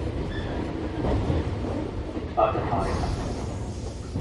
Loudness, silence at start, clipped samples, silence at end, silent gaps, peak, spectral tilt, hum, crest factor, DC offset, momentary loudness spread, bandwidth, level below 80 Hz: -28 LUFS; 0 s; under 0.1%; 0 s; none; -8 dBFS; -7 dB/octave; none; 20 dB; under 0.1%; 9 LU; 11.5 kHz; -34 dBFS